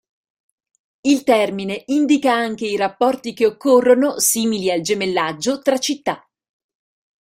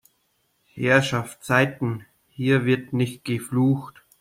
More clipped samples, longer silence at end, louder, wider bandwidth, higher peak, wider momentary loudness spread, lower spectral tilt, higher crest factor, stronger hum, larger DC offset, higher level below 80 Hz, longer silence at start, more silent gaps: neither; first, 1.05 s vs 0.3 s; first, -18 LUFS vs -23 LUFS; about the same, 16 kHz vs 16 kHz; about the same, -2 dBFS vs -4 dBFS; second, 7 LU vs 10 LU; second, -3 dB/octave vs -6 dB/octave; about the same, 16 dB vs 20 dB; neither; neither; about the same, -64 dBFS vs -62 dBFS; first, 1.05 s vs 0.75 s; neither